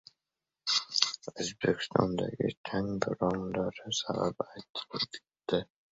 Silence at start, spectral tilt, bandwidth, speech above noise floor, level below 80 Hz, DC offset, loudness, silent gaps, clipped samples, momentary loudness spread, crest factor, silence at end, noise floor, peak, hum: 0.65 s; -4 dB/octave; 8 kHz; 57 dB; -62 dBFS; under 0.1%; -32 LUFS; 2.57-2.64 s, 4.70-4.74 s; under 0.1%; 9 LU; 30 dB; 0.3 s; -90 dBFS; -4 dBFS; none